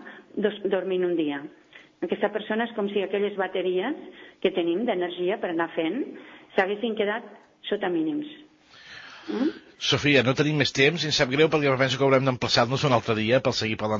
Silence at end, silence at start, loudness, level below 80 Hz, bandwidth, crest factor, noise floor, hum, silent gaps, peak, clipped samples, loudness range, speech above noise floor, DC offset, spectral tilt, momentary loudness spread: 0 s; 0 s; -25 LUFS; -60 dBFS; 7.6 kHz; 18 dB; -50 dBFS; none; none; -6 dBFS; under 0.1%; 7 LU; 26 dB; under 0.1%; -5 dB/octave; 15 LU